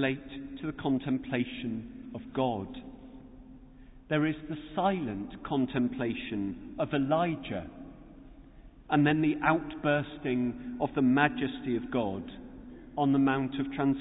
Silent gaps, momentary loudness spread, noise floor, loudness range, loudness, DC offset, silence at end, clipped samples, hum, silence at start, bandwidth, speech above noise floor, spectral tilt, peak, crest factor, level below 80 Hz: none; 17 LU; -52 dBFS; 6 LU; -31 LUFS; under 0.1%; 0 s; under 0.1%; none; 0 s; 4 kHz; 22 dB; -10.5 dB/octave; -12 dBFS; 20 dB; -56 dBFS